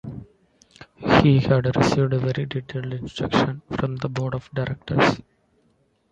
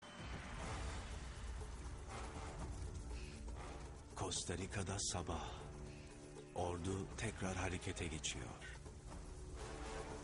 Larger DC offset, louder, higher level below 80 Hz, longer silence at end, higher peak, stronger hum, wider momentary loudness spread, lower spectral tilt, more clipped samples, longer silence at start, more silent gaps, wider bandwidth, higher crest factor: neither; first, -22 LUFS vs -47 LUFS; first, -46 dBFS vs -52 dBFS; first, 0.9 s vs 0 s; first, -2 dBFS vs -28 dBFS; neither; about the same, 13 LU vs 11 LU; first, -7 dB/octave vs -4 dB/octave; neither; about the same, 0.05 s vs 0 s; neither; second, 8.2 kHz vs 11.5 kHz; about the same, 22 dB vs 18 dB